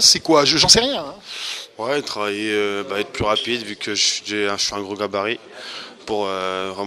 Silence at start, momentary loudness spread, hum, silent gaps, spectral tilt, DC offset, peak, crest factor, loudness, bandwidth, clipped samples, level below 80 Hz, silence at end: 0 s; 16 LU; none; none; -1.5 dB/octave; under 0.1%; 0 dBFS; 20 dB; -19 LUFS; 14.5 kHz; under 0.1%; -48 dBFS; 0 s